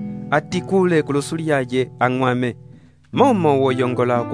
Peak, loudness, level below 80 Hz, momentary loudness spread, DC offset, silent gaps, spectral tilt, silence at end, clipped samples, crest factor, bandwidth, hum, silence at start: -2 dBFS; -19 LUFS; -56 dBFS; 7 LU; 0.1%; none; -6.5 dB/octave; 0 s; under 0.1%; 18 dB; 11 kHz; none; 0 s